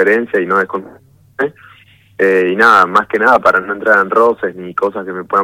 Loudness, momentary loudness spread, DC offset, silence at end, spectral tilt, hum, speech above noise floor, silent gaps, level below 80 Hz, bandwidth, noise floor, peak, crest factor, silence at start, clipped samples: -12 LUFS; 12 LU; under 0.1%; 0 s; -5.5 dB/octave; none; 24 dB; none; -56 dBFS; 16 kHz; -37 dBFS; 0 dBFS; 14 dB; 0 s; 0.5%